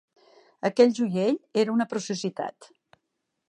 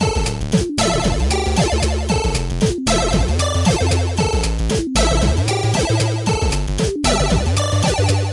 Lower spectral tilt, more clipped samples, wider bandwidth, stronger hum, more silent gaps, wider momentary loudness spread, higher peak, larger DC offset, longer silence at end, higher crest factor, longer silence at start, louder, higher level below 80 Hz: about the same, -5.5 dB/octave vs -4.5 dB/octave; neither; about the same, 10.5 kHz vs 11.5 kHz; neither; neither; first, 11 LU vs 3 LU; about the same, -6 dBFS vs -4 dBFS; neither; first, 0.85 s vs 0 s; first, 20 dB vs 12 dB; first, 0.65 s vs 0 s; second, -25 LUFS vs -18 LUFS; second, -78 dBFS vs -24 dBFS